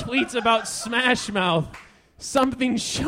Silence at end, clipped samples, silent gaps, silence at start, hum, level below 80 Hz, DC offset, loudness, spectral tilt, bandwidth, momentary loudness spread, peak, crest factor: 0 s; under 0.1%; none; 0 s; none; -50 dBFS; under 0.1%; -22 LUFS; -3.5 dB/octave; 16 kHz; 5 LU; -2 dBFS; 22 dB